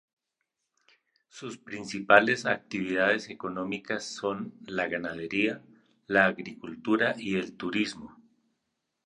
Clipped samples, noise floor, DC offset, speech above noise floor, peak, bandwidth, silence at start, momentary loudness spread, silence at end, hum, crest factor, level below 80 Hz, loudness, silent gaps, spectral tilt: under 0.1%; -83 dBFS; under 0.1%; 54 dB; -4 dBFS; 10.5 kHz; 1.35 s; 17 LU; 0.95 s; none; 26 dB; -68 dBFS; -28 LUFS; none; -4.5 dB/octave